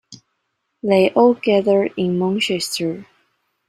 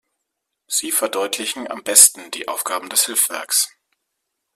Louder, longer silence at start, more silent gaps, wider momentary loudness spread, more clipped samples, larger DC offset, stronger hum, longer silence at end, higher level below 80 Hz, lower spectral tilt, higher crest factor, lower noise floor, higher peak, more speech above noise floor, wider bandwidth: about the same, -18 LUFS vs -16 LUFS; second, 0.1 s vs 0.7 s; neither; second, 11 LU vs 15 LU; neither; neither; neither; second, 0.65 s vs 0.9 s; first, -62 dBFS vs -72 dBFS; first, -5 dB/octave vs 1.5 dB/octave; about the same, 18 dB vs 20 dB; second, -73 dBFS vs -78 dBFS; about the same, -2 dBFS vs 0 dBFS; about the same, 56 dB vs 59 dB; about the same, 15.5 kHz vs 16 kHz